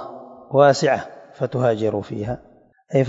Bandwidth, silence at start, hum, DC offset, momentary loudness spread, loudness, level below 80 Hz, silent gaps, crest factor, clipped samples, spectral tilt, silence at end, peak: 7.8 kHz; 0 s; none; under 0.1%; 20 LU; -20 LUFS; -54 dBFS; none; 20 dB; under 0.1%; -6 dB/octave; 0 s; 0 dBFS